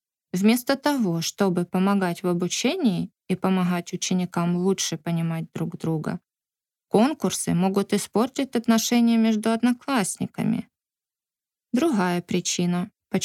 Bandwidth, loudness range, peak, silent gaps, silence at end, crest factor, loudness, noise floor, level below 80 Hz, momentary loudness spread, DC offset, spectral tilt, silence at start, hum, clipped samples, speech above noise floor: 16 kHz; 4 LU; -6 dBFS; none; 0 s; 18 dB; -24 LUFS; under -90 dBFS; -68 dBFS; 8 LU; under 0.1%; -5 dB/octave; 0.35 s; none; under 0.1%; over 67 dB